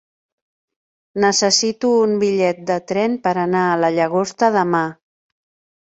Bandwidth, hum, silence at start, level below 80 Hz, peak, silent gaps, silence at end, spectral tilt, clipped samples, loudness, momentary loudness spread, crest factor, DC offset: 8.4 kHz; none; 1.15 s; -64 dBFS; -2 dBFS; none; 1 s; -3.5 dB/octave; under 0.1%; -17 LUFS; 5 LU; 18 dB; under 0.1%